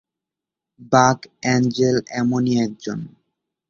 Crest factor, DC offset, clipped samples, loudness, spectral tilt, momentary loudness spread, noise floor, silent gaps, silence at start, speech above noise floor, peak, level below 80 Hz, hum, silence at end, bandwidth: 20 dB; under 0.1%; under 0.1%; -19 LUFS; -5.5 dB/octave; 14 LU; -87 dBFS; none; 0.8 s; 68 dB; 0 dBFS; -56 dBFS; none; 0.6 s; 7.4 kHz